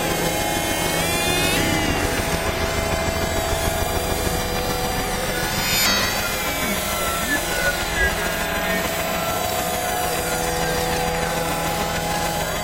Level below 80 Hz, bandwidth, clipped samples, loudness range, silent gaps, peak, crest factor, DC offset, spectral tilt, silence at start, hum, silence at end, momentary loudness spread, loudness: -32 dBFS; 16 kHz; under 0.1%; 2 LU; none; -4 dBFS; 18 dB; under 0.1%; -3 dB/octave; 0 s; none; 0 s; 4 LU; -21 LUFS